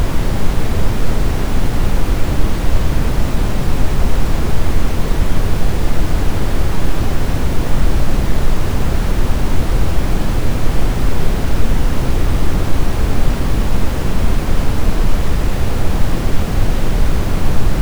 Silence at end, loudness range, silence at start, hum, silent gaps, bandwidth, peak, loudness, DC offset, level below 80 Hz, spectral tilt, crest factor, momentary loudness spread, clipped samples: 0 s; 0 LU; 0 s; none; none; over 20 kHz; 0 dBFS; -20 LUFS; under 0.1%; -16 dBFS; -6 dB/octave; 10 dB; 1 LU; under 0.1%